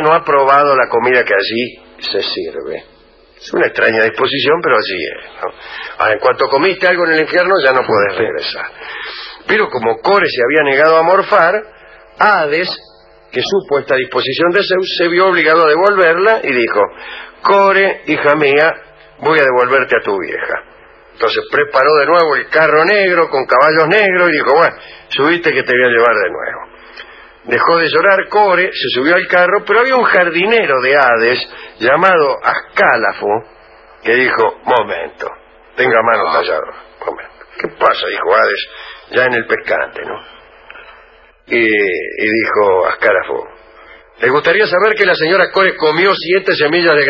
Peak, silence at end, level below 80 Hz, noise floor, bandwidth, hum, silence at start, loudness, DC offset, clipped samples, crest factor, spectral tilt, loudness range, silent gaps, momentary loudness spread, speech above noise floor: 0 dBFS; 0 s; -52 dBFS; -45 dBFS; 6.8 kHz; none; 0 s; -12 LUFS; under 0.1%; under 0.1%; 12 dB; -5.5 dB/octave; 5 LU; none; 14 LU; 33 dB